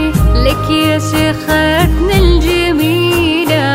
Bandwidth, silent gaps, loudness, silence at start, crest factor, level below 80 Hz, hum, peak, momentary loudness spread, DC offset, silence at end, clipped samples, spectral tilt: 16.5 kHz; none; -11 LUFS; 0 s; 10 dB; -16 dBFS; none; 0 dBFS; 2 LU; under 0.1%; 0 s; under 0.1%; -5.5 dB/octave